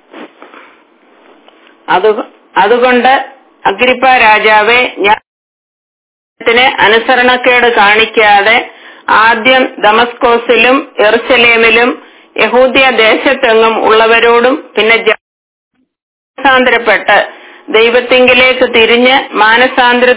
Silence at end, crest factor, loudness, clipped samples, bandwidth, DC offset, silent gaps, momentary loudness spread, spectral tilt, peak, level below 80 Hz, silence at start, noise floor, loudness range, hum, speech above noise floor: 0 s; 8 dB; -7 LUFS; 2%; 4 kHz; under 0.1%; 5.27-6.36 s, 15.21-15.71 s, 16.02-16.34 s; 8 LU; -6.5 dB/octave; 0 dBFS; -44 dBFS; 0.15 s; -44 dBFS; 3 LU; none; 37 dB